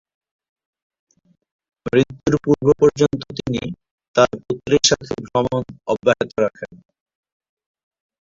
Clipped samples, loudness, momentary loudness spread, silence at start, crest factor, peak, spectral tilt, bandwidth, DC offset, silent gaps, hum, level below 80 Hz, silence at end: under 0.1%; -19 LUFS; 12 LU; 1.85 s; 20 dB; -2 dBFS; -4.5 dB/octave; 7.8 kHz; under 0.1%; 3.91-3.98 s, 4.08-4.14 s; none; -50 dBFS; 1.55 s